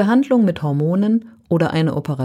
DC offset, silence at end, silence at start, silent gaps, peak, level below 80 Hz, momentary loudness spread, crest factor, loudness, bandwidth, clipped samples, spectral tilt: under 0.1%; 0 s; 0 s; none; -4 dBFS; -54 dBFS; 6 LU; 14 dB; -18 LUFS; 11 kHz; under 0.1%; -8.5 dB/octave